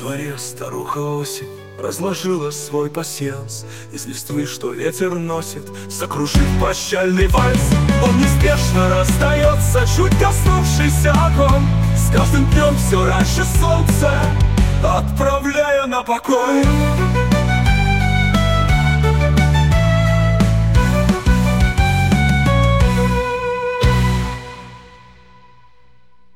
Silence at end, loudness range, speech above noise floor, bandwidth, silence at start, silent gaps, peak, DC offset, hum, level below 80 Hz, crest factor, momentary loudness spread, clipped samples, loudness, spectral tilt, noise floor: 1.55 s; 9 LU; 40 dB; 16.5 kHz; 0 s; none; -2 dBFS; under 0.1%; none; -22 dBFS; 14 dB; 11 LU; under 0.1%; -16 LUFS; -5.5 dB/octave; -56 dBFS